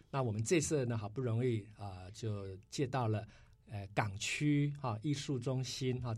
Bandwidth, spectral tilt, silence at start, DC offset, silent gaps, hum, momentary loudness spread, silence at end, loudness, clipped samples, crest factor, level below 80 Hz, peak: 13 kHz; -5.5 dB/octave; 0.15 s; under 0.1%; none; none; 13 LU; 0 s; -37 LUFS; under 0.1%; 20 dB; -64 dBFS; -18 dBFS